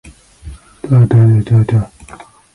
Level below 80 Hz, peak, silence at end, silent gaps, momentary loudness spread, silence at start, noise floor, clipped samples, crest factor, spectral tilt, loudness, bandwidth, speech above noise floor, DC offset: -36 dBFS; 0 dBFS; 0.7 s; none; 16 LU; 0.45 s; -37 dBFS; under 0.1%; 12 dB; -9.5 dB/octave; -11 LUFS; 11 kHz; 28 dB; under 0.1%